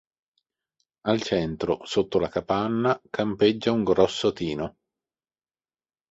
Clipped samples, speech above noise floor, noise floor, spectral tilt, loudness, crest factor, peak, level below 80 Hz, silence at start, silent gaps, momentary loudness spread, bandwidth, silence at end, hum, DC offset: under 0.1%; over 66 dB; under -90 dBFS; -6 dB/octave; -25 LUFS; 20 dB; -6 dBFS; -54 dBFS; 1.05 s; none; 8 LU; 8 kHz; 1.4 s; none; under 0.1%